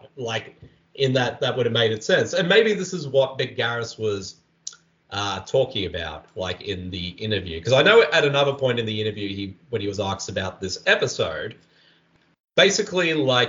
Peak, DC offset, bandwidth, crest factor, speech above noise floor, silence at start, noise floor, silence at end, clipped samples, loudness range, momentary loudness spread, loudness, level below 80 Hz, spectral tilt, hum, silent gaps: -2 dBFS; under 0.1%; 7.6 kHz; 20 dB; 39 dB; 0.05 s; -61 dBFS; 0 s; under 0.1%; 7 LU; 14 LU; -22 LUFS; -56 dBFS; -4 dB/octave; none; 12.40-12.44 s